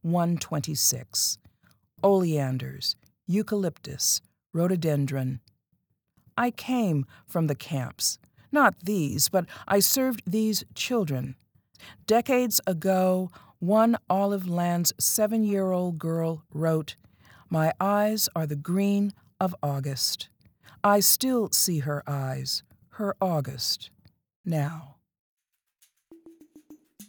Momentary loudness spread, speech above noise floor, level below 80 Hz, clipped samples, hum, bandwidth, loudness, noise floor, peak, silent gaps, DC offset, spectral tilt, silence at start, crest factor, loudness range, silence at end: 10 LU; 49 dB; -70 dBFS; under 0.1%; none; over 20 kHz; -26 LUFS; -74 dBFS; -6 dBFS; 24.36-24.44 s, 25.19-25.37 s; under 0.1%; -4 dB/octave; 0.05 s; 22 dB; 5 LU; 0.05 s